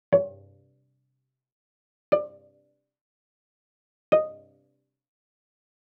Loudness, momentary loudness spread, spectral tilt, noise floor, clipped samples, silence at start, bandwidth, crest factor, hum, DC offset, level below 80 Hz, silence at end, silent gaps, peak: -26 LUFS; 13 LU; -5.5 dB/octave; -79 dBFS; under 0.1%; 0.1 s; 5.2 kHz; 24 dB; none; under 0.1%; -80 dBFS; 1.65 s; 1.52-2.12 s, 3.01-4.12 s; -6 dBFS